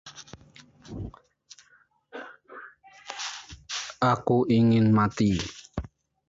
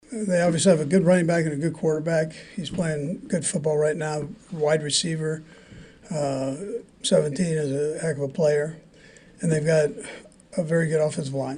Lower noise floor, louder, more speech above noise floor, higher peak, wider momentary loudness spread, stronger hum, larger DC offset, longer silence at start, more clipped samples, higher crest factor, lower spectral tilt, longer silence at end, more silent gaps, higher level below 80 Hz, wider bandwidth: first, -63 dBFS vs -50 dBFS; about the same, -25 LUFS vs -24 LUFS; first, 40 dB vs 27 dB; second, -12 dBFS vs -6 dBFS; first, 24 LU vs 13 LU; neither; neither; about the same, 0.05 s vs 0.1 s; neither; about the same, 16 dB vs 18 dB; about the same, -6 dB/octave vs -5 dB/octave; first, 0.4 s vs 0 s; neither; first, -50 dBFS vs -58 dBFS; second, 7.8 kHz vs 10.5 kHz